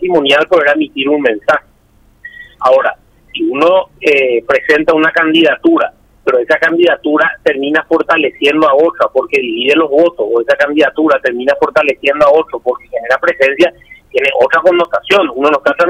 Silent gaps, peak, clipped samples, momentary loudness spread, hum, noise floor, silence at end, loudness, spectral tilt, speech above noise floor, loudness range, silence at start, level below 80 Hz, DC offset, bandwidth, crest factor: none; 0 dBFS; under 0.1%; 6 LU; none; -48 dBFS; 0 s; -11 LUFS; -4.5 dB/octave; 38 dB; 3 LU; 0 s; -50 dBFS; under 0.1%; 12 kHz; 10 dB